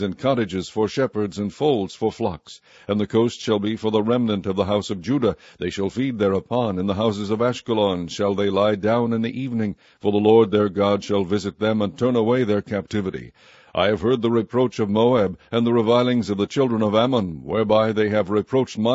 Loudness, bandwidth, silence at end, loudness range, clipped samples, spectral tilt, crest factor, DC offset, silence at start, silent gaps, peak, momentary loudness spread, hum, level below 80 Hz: -21 LUFS; 8 kHz; 0 s; 3 LU; under 0.1%; -6.5 dB/octave; 18 dB; under 0.1%; 0 s; none; -2 dBFS; 7 LU; none; -54 dBFS